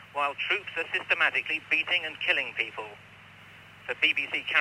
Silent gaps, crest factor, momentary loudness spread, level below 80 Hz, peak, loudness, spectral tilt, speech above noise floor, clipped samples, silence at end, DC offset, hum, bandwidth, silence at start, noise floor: none; 20 dB; 11 LU; -74 dBFS; -10 dBFS; -27 LUFS; -2.5 dB/octave; 22 dB; under 0.1%; 0 s; under 0.1%; none; 16 kHz; 0 s; -51 dBFS